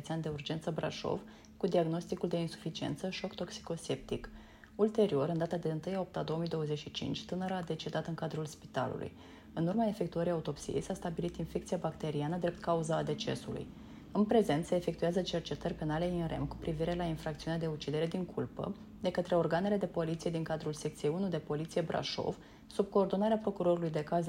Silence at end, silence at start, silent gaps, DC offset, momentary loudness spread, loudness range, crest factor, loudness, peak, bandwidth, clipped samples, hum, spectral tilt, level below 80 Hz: 0 s; 0 s; none; under 0.1%; 9 LU; 3 LU; 20 dB; -36 LUFS; -16 dBFS; 16 kHz; under 0.1%; none; -6.5 dB/octave; -58 dBFS